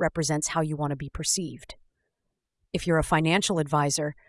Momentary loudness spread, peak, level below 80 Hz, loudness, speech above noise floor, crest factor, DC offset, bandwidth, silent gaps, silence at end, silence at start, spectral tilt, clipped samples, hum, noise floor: 9 LU; -10 dBFS; -46 dBFS; -26 LUFS; 55 dB; 18 dB; under 0.1%; 12 kHz; none; 0.15 s; 0 s; -4 dB/octave; under 0.1%; none; -81 dBFS